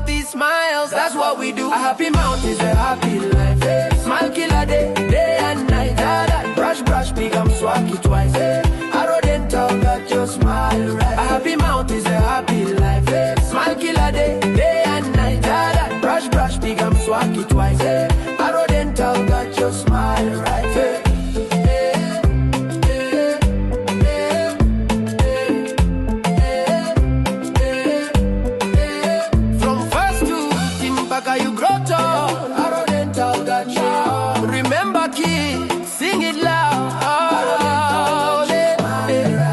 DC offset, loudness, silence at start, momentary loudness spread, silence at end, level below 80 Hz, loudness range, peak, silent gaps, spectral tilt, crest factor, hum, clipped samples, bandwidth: under 0.1%; -18 LUFS; 0 s; 3 LU; 0 s; -24 dBFS; 1 LU; -4 dBFS; none; -5.5 dB/octave; 12 dB; none; under 0.1%; 12.5 kHz